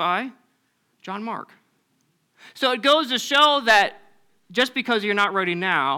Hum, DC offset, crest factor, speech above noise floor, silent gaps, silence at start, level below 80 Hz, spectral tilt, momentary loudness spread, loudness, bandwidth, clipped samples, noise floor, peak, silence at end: none; under 0.1%; 18 dB; 47 dB; none; 0 s; -68 dBFS; -3 dB/octave; 16 LU; -20 LUFS; 19 kHz; under 0.1%; -68 dBFS; -6 dBFS; 0 s